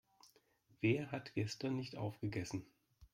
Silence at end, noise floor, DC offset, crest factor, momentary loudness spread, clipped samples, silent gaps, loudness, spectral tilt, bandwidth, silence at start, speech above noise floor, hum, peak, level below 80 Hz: 0.1 s; -73 dBFS; under 0.1%; 20 dB; 8 LU; under 0.1%; none; -41 LUFS; -6 dB/octave; 15.5 kHz; 0.8 s; 33 dB; none; -22 dBFS; -72 dBFS